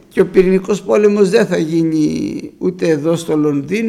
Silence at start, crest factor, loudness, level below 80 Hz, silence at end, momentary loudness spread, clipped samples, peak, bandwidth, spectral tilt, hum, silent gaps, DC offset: 0.15 s; 14 dB; -14 LUFS; -44 dBFS; 0 s; 8 LU; under 0.1%; 0 dBFS; 13.5 kHz; -6.5 dB/octave; none; none; under 0.1%